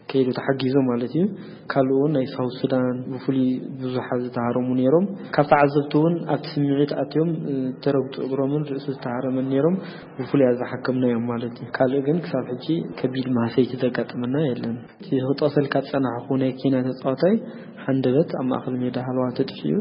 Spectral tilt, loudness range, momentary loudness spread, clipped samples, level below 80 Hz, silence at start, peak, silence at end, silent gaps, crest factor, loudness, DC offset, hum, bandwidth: -12 dB/octave; 3 LU; 7 LU; under 0.1%; -62 dBFS; 0.1 s; -4 dBFS; 0 s; none; 18 dB; -23 LUFS; under 0.1%; none; 5.4 kHz